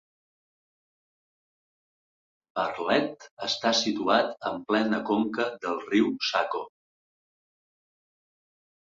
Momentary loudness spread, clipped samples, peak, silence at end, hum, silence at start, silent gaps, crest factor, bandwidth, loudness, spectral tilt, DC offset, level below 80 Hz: 10 LU; under 0.1%; -8 dBFS; 2.15 s; none; 2.55 s; 3.31-3.37 s; 22 dB; 7.8 kHz; -27 LUFS; -3.5 dB/octave; under 0.1%; -72 dBFS